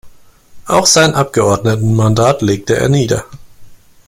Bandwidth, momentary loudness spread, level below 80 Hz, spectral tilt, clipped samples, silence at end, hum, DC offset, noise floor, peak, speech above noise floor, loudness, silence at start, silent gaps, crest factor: 16 kHz; 6 LU; -40 dBFS; -4.5 dB/octave; under 0.1%; 0.3 s; none; under 0.1%; -37 dBFS; 0 dBFS; 26 dB; -12 LUFS; 0.05 s; none; 14 dB